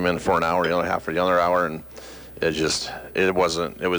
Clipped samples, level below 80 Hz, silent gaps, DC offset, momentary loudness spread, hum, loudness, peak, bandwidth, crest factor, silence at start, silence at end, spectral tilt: under 0.1%; -48 dBFS; none; under 0.1%; 12 LU; none; -22 LUFS; -10 dBFS; over 20 kHz; 14 dB; 0 s; 0 s; -4 dB/octave